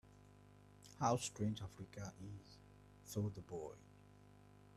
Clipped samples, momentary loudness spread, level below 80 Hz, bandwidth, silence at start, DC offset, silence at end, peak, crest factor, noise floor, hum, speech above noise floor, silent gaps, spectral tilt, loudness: under 0.1%; 26 LU; -70 dBFS; 14 kHz; 0.05 s; under 0.1%; 0 s; -24 dBFS; 22 dB; -64 dBFS; 50 Hz at -60 dBFS; 20 dB; none; -5.5 dB/octave; -45 LUFS